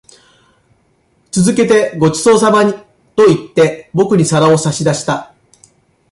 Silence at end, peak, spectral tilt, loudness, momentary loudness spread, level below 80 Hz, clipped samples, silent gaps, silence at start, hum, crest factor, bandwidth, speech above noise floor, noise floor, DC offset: 0.85 s; 0 dBFS; -5.5 dB/octave; -12 LUFS; 9 LU; -50 dBFS; under 0.1%; none; 1.35 s; none; 12 dB; 11.5 kHz; 45 dB; -56 dBFS; under 0.1%